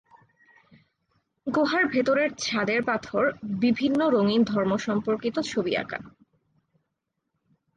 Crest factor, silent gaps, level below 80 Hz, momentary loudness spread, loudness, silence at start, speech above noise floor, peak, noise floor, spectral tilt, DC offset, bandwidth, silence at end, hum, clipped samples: 16 dB; none; -64 dBFS; 6 LU; -25 LUFS; 1.45 s; 56 dB; -12 dBFS; -81 dBFS; -5 dB/octave; under 0.1%; 9.4 kHz; 1.65 s; none; under 0.1%